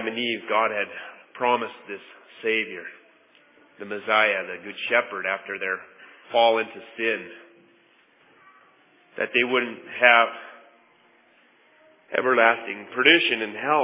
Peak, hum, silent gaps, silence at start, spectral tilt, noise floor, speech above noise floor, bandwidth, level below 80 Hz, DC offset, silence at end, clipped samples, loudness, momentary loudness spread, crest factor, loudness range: -2 dBFS; none; none; 0 s; -6.5 dB/octave; -59 dBFS; 36 dB; 3.9 kHz; -82 dBFS; under 0.1%; 0 s; under 0.1%; -22 LUFS; 21 LU; 24 dB; 6 LU